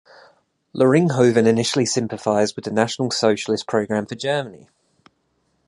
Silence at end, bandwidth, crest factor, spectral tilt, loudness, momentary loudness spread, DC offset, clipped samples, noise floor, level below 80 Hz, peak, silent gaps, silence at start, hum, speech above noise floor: 1.1 s; 11.5 kHz; 20 dB; -5 dB/octave; -19 LUFS; 8 LU; under 0.1%; under 0.1%; -68 dBFS; -62 dBFS; -2 dBFS; none; 0.75 s; none; 48 dB